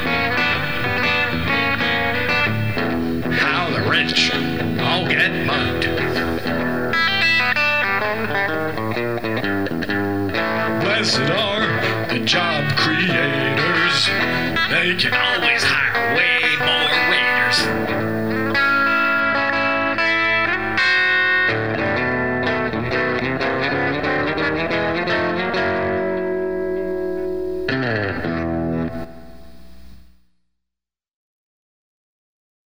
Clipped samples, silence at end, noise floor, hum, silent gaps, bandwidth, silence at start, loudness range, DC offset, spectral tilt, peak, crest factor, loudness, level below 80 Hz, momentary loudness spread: under 0.1%; 0 s; -85 dBFS; none; none; 18 kHz; 0 s; 7 LU; 1%; -4.5 dB/octave; -4 dBFS; 16 dB; -18 LUFS; -46 dBFS; 7 LU